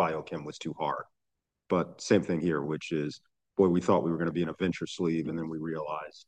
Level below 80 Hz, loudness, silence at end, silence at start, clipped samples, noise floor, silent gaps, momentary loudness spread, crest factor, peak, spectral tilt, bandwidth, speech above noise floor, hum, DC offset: -68 dBFS; -31 LUFS; 0.05 s; 0 s; under 0.1%; -85 dBFS; none; 12 LU; 20 dB; -10 dBFS; -6.5 dB/octave; 9.4 kHz; 55 dB; none; under 0.1%